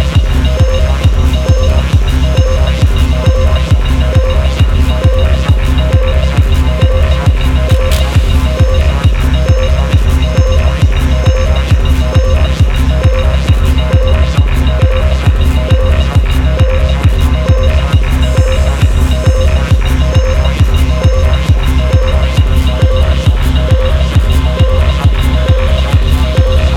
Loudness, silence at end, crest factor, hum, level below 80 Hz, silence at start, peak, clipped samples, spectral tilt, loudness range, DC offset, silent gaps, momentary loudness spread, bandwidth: -11 LUFS; 0 s; 8 dB; none; -10 dBFS; 0 s; 0 dBFS; under 0.1%; -6.5 dB/octave; 0 LU; under 0.1%; none; 1 LU; 13.5 kHz